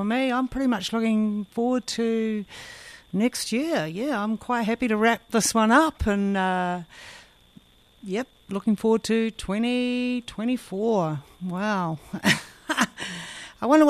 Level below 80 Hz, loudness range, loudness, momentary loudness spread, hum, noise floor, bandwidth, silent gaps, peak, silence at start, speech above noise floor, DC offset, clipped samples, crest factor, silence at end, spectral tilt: -50 dBFS; 4 LU; -25 LUFS; 12 LU; none; -54 dBFS; 14 kHz; none; -6 dBFS; 0 s; 30 dB; under 0.1%; under 0.1%; 20 dB; 0 s; -4.5 dB/octave